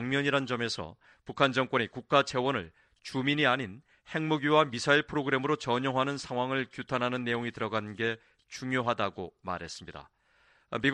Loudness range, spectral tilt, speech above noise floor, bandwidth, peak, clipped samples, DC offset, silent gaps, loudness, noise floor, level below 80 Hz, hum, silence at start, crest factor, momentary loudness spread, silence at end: 6 LU; -5 dB/octave; 36 dB; 10.5 kHz; -8 dBFS; under 0.1%; under 0.1%; none; -30 LUFS; -66 dBFS; -64 dBFS; none; 0 s; 24 dB; 16 LU; 0 s